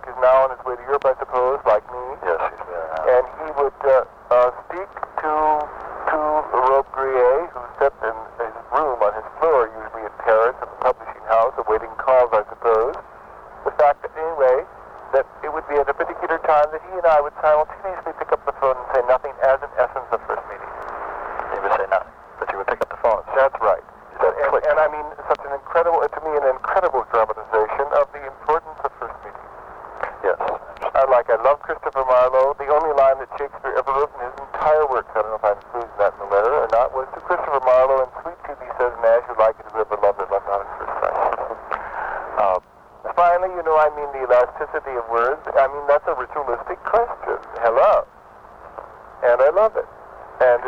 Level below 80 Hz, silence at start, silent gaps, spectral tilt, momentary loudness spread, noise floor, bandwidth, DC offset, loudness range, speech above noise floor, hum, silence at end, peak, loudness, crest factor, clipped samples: -48 dBFS; 0 s; none; -6 dB/octave; 13 LU; -45 dBFS; 6.6 kHz; under 0.1%; 3 LU; 25 dB; none; 0 s; -4 dBFS; -20 LUFS; 16 dB; under 0.1%